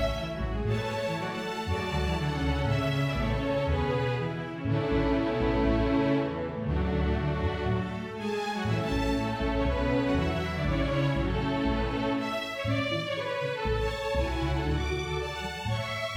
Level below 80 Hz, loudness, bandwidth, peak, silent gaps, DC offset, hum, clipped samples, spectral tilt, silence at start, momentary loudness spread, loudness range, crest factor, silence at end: -36 dBFS; -29 LUFS; 15.5 kHz; -14 dBFS; none; under 0.1%; none; under 0.1%; -6.5 dB/octave; 0 s; 5 LU; 2 LU; 14 dB; 0 s